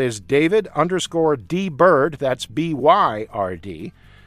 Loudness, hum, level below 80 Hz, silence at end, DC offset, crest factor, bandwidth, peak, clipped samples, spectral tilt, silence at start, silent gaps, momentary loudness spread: -19 LUFS; none; -52 dBFS; 0.35 s; under 0.1%; 18 dB; 14 kHz; -2 dBFS; under 0.1%; -5.5 dB/octave; 0 s; none; 12 LU